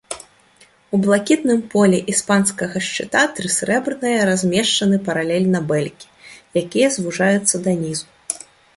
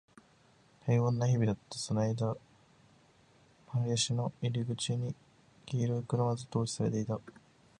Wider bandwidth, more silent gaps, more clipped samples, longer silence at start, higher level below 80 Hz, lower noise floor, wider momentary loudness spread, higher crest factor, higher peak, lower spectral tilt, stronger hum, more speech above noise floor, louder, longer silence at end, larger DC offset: about the same, 11.5 kHz vs 11 kHz; neither; neither; second, 0.1 s vs 0.85 s; first, -58 dBFS vs -66 dBFS; second, -52 dBFS vs -65 dBFS; about the same, 11 LU vs 9 LU; about the same, 18 dB vs 18 dB; first, -2 dBFS vs -16 dBFS; second, -4 dB/octave vs -6 dB/octave; neither; about the same, 35 dB vs 33 dB; first, -18 LUFS vs -33 LUFS; about the same, 0.4 s vs 0.5 s; neither